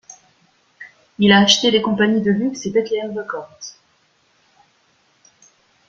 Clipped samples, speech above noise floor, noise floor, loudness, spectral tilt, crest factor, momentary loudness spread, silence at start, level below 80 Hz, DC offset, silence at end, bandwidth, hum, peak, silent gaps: under 0.1%; 43 dB; -60 dBFS; -16 LUFS; -4 dB/octave; 20 dB; 23 LU; 0.8 s; -58 dBFS; under 0.1%; 2.2 s; 7.6 kHz; none; 0 dBFS; none